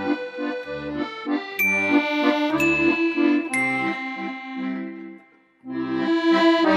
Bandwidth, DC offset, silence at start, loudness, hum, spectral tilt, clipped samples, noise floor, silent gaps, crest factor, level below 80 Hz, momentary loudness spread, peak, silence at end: 14.5 kHz; under 0.1%; 0 s; -22 LUFS; none; -4.5 dB/octave; under 0.1%; -52 dBFS; none; 16 dB; -58 dBFS; 13 LU; -6 dBFS; 0 s